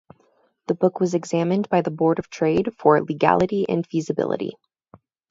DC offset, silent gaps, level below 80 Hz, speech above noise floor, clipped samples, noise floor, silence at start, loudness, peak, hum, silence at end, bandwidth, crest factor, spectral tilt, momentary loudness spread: under 0.1%; none; -58 dBFS; 42 dB; under 0.1%; -63 dBFS; 0.7 s; -21 LUFS; 0 dBFS; none; 0.8 s; 7.8 kHz; 22 dB; -7 dB/octave; 7 LU